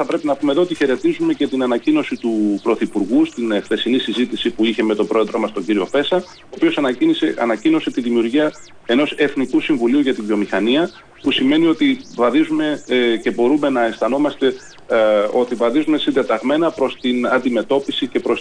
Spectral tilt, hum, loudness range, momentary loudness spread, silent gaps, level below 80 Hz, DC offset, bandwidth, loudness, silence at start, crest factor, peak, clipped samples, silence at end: -5.5 dB/octave; none; 1 LU; 5 LU; none; -56 dBFS; under 0.1%; 10 kHz; -17 LUFS; 0 s; 12 dB; -6 dBFS; under 0.1%; 0 s